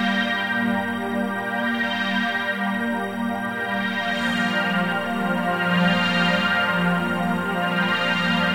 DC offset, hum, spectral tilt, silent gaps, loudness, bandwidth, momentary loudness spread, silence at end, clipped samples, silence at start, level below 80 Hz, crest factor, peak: under 0.1%; none; -5.5 dB/octave; none; -22 LUFS; 16 kHz; 6 LU; 0 s; under 0.1%; 0 s; -58 dBFS; 16 dB; -6 dBFS